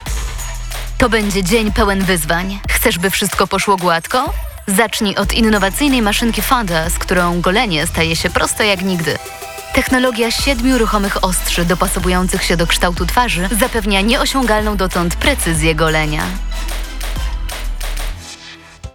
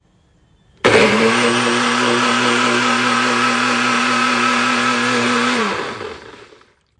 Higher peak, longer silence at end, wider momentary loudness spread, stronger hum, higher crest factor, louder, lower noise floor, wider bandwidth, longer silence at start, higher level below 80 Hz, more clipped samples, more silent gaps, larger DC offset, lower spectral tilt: about the same, 0 dBFS vs 0 dBFS; second, 0.05 s vs 0.55 s; first, 11 LU vs 7 LU; neither; about the same, 16 dB vs 16 dB; about the same, -15 LUFS vs -14 LUFS; second, -36 dBFS vs -55 dBFS; first, 19.5 kHz vs 11.5 kHz; second, 0 s vs 0.85 s; first, -24 dBFS vs -54 dBFS; neither; neither; first, 0.2% vs under 0.1%; about the same, -4 dB/octave vs -3 dB/octave